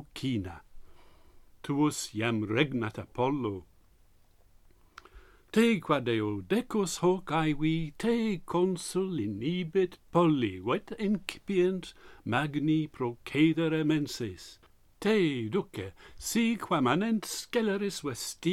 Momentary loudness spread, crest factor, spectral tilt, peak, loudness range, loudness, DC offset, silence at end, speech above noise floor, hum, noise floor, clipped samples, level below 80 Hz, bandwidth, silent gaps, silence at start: 10 LU; 20 dB; -5.5 dB/octave; -12 dBFS; 3 LU; -30 LUFS; under 0.1%; 0 s; 31 dB; none; -61 dBFS; under 0.1%; -56 dBFS; 15.5 kHz; none; 0 s